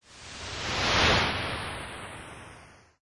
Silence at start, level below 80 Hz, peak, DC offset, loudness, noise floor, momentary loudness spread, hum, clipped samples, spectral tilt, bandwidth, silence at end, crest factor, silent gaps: 0.1 s; -46 dBFS; -10 dBFS; under 0.1%; -26 LUFS; -52 dBFS; 22 LU; none; under 0.1%; -3 dB/octave; 11.5 kHz; 0.4 s; 20 dB; none